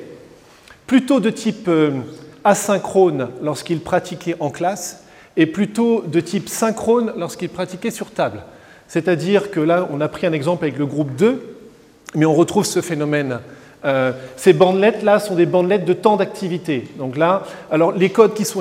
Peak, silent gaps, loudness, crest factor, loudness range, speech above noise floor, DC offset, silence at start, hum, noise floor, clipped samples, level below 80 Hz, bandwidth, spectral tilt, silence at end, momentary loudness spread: 0 dBFS; none; -18 LUFS; 18 dB; 4 LU; 29 dB; under 0.1%; 0 s; none; -46 dBFS; under 0.1%; -60 dBFS; 16.5 kHz; -5.5 dB/octave; 0 s; 11 LU